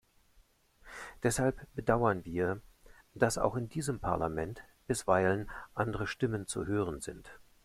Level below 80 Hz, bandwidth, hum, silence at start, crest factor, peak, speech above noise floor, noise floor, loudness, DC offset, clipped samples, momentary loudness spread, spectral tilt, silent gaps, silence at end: -54 dBFS; 15.5 kHz; none; 0.85 s; 22 dB; -12 dBFS; 34 dB; -66 dBFS; -33 LUFS; under 0.1%; under 0.1%; 14 LU; -5.5 dB/octave; none; 0.25 s